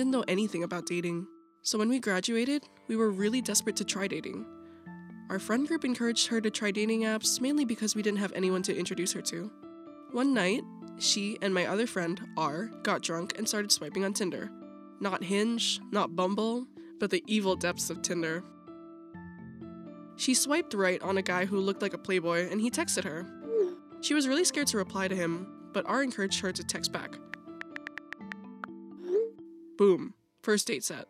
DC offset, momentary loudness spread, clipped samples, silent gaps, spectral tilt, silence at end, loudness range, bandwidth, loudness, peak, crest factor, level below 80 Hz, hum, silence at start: under 0.1%; 18 LU; under 0.1%; none; -3.5 dB/octave; 0.05 s; 4 LU; 15.5 kHz; -30 LUFS; -10 dBFS; 22 dB; -76 dBFS; none; 0 s